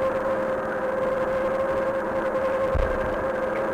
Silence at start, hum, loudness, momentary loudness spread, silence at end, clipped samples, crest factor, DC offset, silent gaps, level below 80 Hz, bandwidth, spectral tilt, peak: 0 s; none; -25 LUFS; 2 LU; 0 s; under 0.1%; 12 dB; under 0.1%; none; -38 dBFS; 14.5 kHz; -7 dB/octave; -14 dBFS